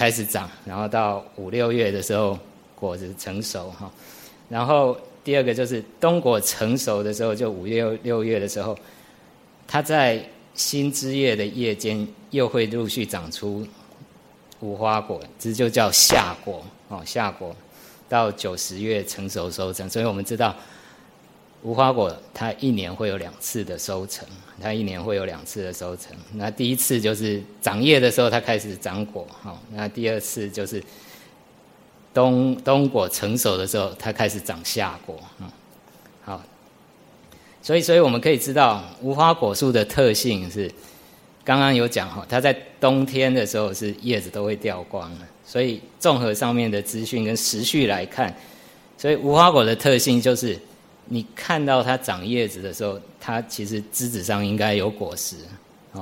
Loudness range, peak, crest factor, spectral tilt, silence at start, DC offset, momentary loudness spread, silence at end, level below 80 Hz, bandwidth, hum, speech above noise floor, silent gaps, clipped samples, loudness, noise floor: 8 LU; 0 dBFS; 24 dB; -4 dB/octave; 0 s; under 0.1%; 16 LU; 0 s; -56 dBFS; 16.5 kHz; none; 29 dB; none; under 0.1%; -22 LUFS; -52 dBFS